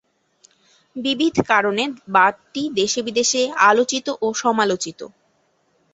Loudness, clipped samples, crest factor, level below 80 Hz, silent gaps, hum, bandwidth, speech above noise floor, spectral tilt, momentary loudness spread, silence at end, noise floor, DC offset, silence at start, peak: -19 LUFS; under 0.1%; 20 dB; -60 dBFS; none; none; 8.2 kHz; 45 dB; -2.5 dB/octave; 12 LU; 0.85 s; -64 dBFS; under 0.1%; 0.95 s; -2 dBFS